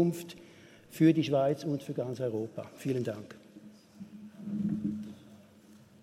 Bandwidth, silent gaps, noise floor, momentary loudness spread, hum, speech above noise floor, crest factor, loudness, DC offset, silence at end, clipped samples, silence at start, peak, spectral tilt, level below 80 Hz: 15.5 kHz; none; -57 dBFS; 24 LU; none; 27 dB; 20 dB; -32 LUFS; under 0.1%; 0.25 s; under 0.1%; 0 s; -14 dBFS; -7.5 dB/octave; -72 dBFS